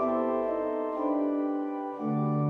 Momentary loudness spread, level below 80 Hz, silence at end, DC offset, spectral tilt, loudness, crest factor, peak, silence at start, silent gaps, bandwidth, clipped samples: 4 LU; -66 dBFS; 0 s; under 0.1%; -11 dB/octave; -30 LUFS; 12 dB; -16 dBFS; 0 s; none; 4 kHz; under 0.1%